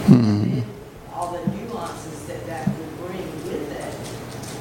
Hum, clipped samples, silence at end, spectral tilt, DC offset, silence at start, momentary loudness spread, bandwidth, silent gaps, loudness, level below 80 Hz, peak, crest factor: none; under 0.1%; 0 s; -7 dB/octave; under 0.1%; 0 s; 13 LU; 17 kHz; none; -25 LUFS; -48 dBFS; -2 dBFS; 22 dB